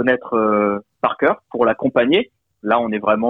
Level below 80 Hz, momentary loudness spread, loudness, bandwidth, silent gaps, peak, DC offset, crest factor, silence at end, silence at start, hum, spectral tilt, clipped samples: -58 dBFS; 6 LU; -18 LUFS; 4.5 kHz; none; -2 dBFS; under 0.1%; 16 dB; 0 s; 0 s; none; -8.5 dB/octave; under 0.1%